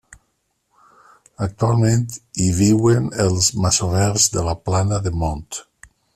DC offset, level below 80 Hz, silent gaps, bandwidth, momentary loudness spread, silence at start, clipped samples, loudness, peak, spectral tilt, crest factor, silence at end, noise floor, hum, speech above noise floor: under 0.1%; -40 dBFS; none; 13.5 kHz; 12 LU; 1.4 s; under 0.1%; -18 LUFS; -2 dBFS; -5 dB/octave; 18 dB; 0.55 s; -69 dBFS; none; 51 dB